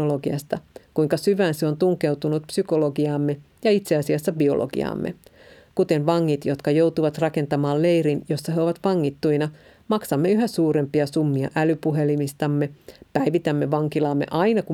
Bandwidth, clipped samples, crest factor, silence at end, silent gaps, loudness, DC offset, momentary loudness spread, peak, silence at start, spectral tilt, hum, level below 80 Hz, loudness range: 16 kHz; under 0.1%; 16 dB; 0 s; none; -23 LUFS; under 0.1%; 6 LU; -4 dBFS; 0 s; -7 dB/octave; none; -60 dBFS; 1 LU